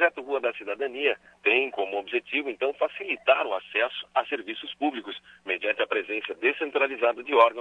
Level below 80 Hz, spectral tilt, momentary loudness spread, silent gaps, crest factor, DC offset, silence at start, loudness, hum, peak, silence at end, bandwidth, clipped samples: -74 dBFS; -4 dB/octave; 9 LU; none; 20 dB; under 0.1%; 0 s; -26 LUFS; none; -6 dBFS; 0 s; 9.4 kHz; under 0.1%